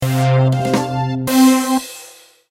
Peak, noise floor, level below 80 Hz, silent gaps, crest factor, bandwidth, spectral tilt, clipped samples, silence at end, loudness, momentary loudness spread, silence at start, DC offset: -2 dBFS; -42 dBFS; -52 dBFS; none; 14 dB; 16 kHz; -6 dB/octave; under 0.1%; 0.4 s; -15 LUFS; 10 LU; 0 s; under 0.1%